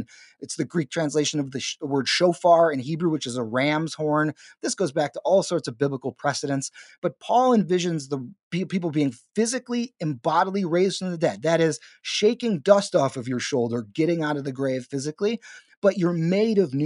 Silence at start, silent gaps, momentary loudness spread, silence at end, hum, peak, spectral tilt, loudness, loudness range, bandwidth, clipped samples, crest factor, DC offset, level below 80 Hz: 0 s; 6.98-7.02 s, 8.43-8.51 s, 15.77-15.82 s; 10 LU; 0 s; none; -2 dBFS; -5 dB/octave; -24 LUFS; 3 LU; 11.5 kHz; under 0.1%; 22 dB; under 0.1%; -72 dBFS